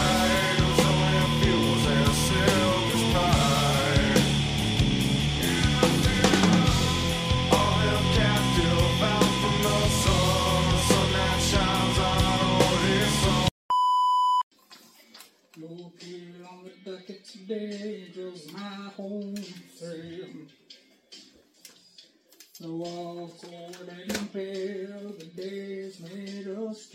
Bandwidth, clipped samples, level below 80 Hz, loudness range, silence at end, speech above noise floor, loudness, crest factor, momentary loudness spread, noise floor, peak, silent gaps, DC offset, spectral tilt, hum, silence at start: 16 kHz; under 0.1%; -38 dBFS; 19 LU; 0.1 s; 20 dB; -23 LUFS; 20 dB; 20 LU; -57 dBFS; -6 dBFS; 13.51-13.69 s, 14.43-14.51 s; under 0.1%; -4.5 dB/octave; none; 0 s